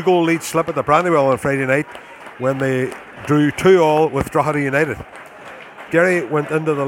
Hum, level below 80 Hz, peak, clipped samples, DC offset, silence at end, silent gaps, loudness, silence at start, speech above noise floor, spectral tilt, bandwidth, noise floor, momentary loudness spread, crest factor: none; -48 dBFS; 0 dBFS; under 0.1%; under 0.1%; 0 s; none; -17 LUFS; 0 s; 21 dB; -6 dB/octave; 17 kHz; -37 dBFS; 22 LU; 16 dB